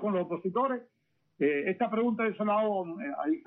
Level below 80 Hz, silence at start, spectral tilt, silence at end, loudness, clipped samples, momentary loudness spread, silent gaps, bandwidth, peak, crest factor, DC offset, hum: -78 dBFS; 0 s; -5.5 dB/octave; 0.05 s; -30 LUFS; under 0.1%; 6 LU; none; 4 kHz; -16 dBFS; 14 dB; under 0.1%; none